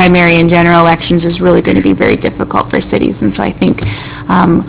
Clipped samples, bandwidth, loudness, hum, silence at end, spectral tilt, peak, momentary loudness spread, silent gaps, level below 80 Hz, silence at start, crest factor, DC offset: 0.7%; 4 kHz; -10 LUFS; none; 0 s; -10.5 dB/octave; 0 dBFS; 7 LU; none; -30 dBFS; 0 s; 10 dB; under 0.1%